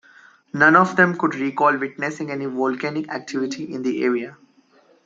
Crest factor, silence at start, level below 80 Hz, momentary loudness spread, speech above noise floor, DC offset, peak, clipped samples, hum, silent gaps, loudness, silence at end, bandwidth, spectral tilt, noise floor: 20 dB; 0.55 s; -70 dBFS; 13 LU; 36 dB; under 0.1%; -2 dBFS; under 0.1%; none; none; -20 LUFS; 0.7 s; 7.8 kHz; -6 dB/octave; -56 dBFS